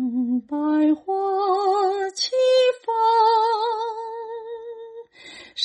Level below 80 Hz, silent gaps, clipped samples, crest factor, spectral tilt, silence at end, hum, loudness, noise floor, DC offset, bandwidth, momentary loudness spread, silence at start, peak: -72 dBFS; none; under 0.1%; 14 dB; -2.5 dB/octave; 0 s; none; -21 LUFS; -44 dBFS; under 0.1%; 10 kHz; 19 LU; 0 s; -8 dBFS